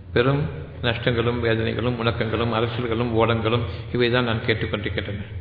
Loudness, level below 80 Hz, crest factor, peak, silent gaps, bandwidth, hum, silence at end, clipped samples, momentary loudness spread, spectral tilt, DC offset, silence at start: -23 LUFS; -42 dBFS; 18 dB; -4 dBFS; none; 4.9 kHz; none; 0 s; under 0.1%; 6 LU; -9.5 dB/octave; under 0.1%; 0 s